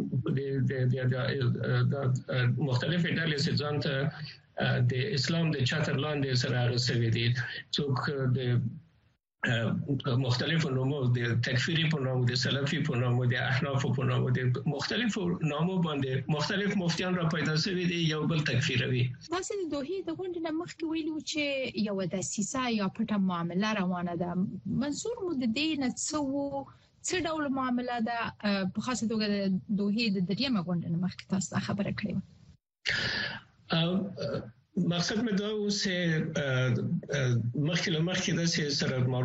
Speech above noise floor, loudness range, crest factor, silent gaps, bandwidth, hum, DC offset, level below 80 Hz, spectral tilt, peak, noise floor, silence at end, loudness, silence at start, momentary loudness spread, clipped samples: 39 dB; 3 LU; 16 dB; none; 8.4 kHz; none; under 0.1%; -60 dBFS; -5.5 dB/octave; -14 dBFS; -69 dBFS; 0 s; -30 LUFS; 0 s; 6 LU; under 0.1%